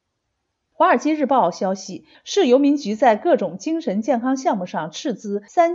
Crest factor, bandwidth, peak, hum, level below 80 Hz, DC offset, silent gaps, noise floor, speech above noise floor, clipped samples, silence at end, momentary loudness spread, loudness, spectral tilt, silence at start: 16 dB; 7.8 kHz; -4 dBFS; none; -74 dBFS; under 0.1%; none; -75 dBFS; 56 dB; under 0.1%; 0 s; 11 LU; -20 LUFS; -5 dB/octave; 0.8 s